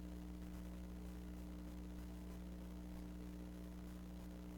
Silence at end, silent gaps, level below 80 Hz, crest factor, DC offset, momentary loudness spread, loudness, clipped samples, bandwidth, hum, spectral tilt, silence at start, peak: 0 s; none; -54 dBFS; 12 dB; under 0.1%; 1 LU; -53 LUFS; under 0.1%; 17.5 kHz; 60 Hz at -50 dBFS; -7 dB/octave; 0 s; -38 dBFS